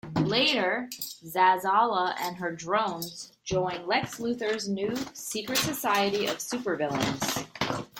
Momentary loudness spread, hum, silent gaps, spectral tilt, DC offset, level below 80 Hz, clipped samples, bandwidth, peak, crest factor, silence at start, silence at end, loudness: 10 LU; none; none; -3.5 dB/octave; under 0.1%; -62 dBFS; under 0.1%; 17 kHz; -10 dBFS; 18 dB; 0.05 s; 0 s; -28 LUFS